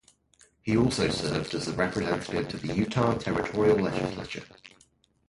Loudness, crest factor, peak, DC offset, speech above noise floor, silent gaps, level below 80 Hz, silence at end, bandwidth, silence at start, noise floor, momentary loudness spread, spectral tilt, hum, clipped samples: -28 LUFS; 18 dB; -10 dBFS; under 0.1%; 37 dB; none; -50 dBFS; 0.6 s; 11.5 kHz; 0.65 s; -64 dBFS; 9 LU; -5.5 dB/octave; none; under 0.1%